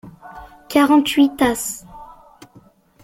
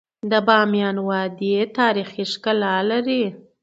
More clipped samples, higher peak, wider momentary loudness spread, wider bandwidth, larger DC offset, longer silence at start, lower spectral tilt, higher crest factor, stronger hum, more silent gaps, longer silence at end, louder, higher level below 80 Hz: neither; about the same, -2 dBFS vs 0 dBFS; first, 25 LU vs 8 LU; first, 17 kHz vs 8 kHz; neither; second, 0.05 s vs 0.25 s; second, -3 dB/octave vs -6 dB/octave; about the same, 18 dB vs 20 dB; neither; neither; first, 1 s vs 0.25 s; first, -17 LUFS vs -20 LUFS; first, -50 dBFS vs -70 dBFS